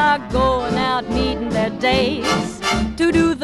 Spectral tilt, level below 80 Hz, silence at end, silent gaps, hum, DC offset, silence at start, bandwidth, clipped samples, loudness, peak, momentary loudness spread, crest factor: -5 dB/octave; -32 dBFS; 0 s; none; none; under 0.1%; 0 s; 13 kHz; under 0.1%; -19 LUFS; -4 dBFS; 4 LU; 14 dB